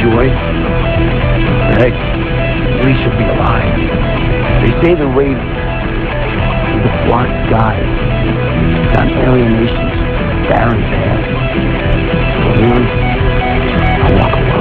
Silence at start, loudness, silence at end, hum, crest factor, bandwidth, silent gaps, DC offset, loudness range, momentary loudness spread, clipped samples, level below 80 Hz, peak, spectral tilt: 0 s; -12 LUFS; 0 s; none; 12 dB; 4.7 kHz; none; 0.6%; 1 LU; 5 LU; under 0.1%; -18 dBFS; 0 dBFS; -10 dB/octave